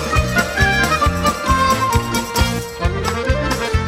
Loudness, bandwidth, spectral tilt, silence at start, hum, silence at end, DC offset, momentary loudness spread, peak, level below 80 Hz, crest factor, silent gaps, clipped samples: -17 LUFS; 16 kHz; -4.5 dB/octave; 0 s; none; 0 s; under 0.1%; 5 LU; -2 dBFS; -24 dBFS; 16 dB; none; under 0.1%